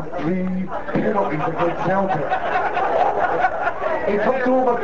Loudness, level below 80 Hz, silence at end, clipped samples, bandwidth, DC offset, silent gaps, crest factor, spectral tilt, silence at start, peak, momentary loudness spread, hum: -21 LUFS; -48 dBFS; 0 s; under 0.1%; 7.6 kHz; 4%; none; 14 dB; -7.5 dB/octave; 0 s; -6 dBFS; 5 LU; none